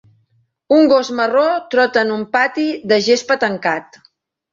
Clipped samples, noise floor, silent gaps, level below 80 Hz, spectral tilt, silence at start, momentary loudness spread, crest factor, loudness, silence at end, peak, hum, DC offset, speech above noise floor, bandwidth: under 0.1%; -61 dBFS; none; -62 dBFS; -4 dB/octave; 0.7 s; 7 LU; 14 dB; -15 LUFS; 0.7 s; -2 dBFS; none; under 0.1%; 46 dB; 7.6 kHz